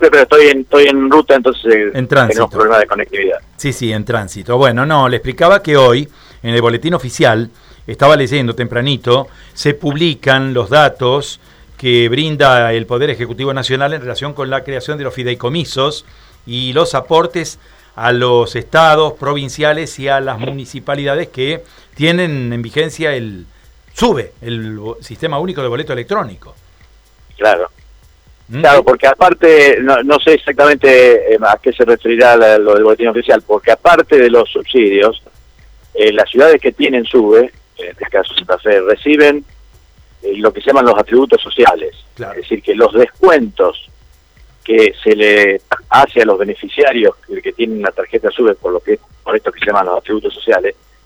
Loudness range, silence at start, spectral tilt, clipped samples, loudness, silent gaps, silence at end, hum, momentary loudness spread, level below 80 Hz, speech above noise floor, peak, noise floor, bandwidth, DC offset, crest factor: 9 LU; 0 s; -5.5 dB/octave; 0.5%; -11 LUFS; none; 0.35 s; none; 14 LU; -42 dBFS; 34 dB; 0 dBFS; -45 dBFS; 18.5 kHz; under 0.1%; 12 dB